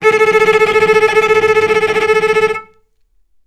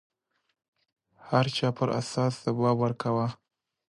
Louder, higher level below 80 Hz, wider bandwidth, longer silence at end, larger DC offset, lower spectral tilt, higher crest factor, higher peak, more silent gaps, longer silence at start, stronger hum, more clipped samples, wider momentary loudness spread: first, -11 LUFS vs -28 LUFS; first, -52 dBFS vs -66 dBFS; about the same, 12.5 kHz vs 11.5 kHz; first, 0.85 s vs 0.55 s; neither; second, -3.5 dB/octave vs -6.5 dB/octave; second, 12 dB vs 20 dB; first, 0 dBFS vs -10 dBFS; neither; second, 0 s vs 1.25 s; neither; neither; about the same, 4 LU vs 4 LU